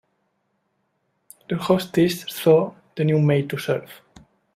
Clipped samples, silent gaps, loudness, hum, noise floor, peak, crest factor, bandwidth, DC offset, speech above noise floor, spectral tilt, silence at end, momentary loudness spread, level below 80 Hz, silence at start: under 0.1%; none; -21 LUFS; none; -72 dBFS; -2 dBFS; 20 dB; 16 kHz; under 0.1%; 52 dB; -6.5 dB/octave; 0.6 s; 10 LU; -60 dBFS; 1.5 s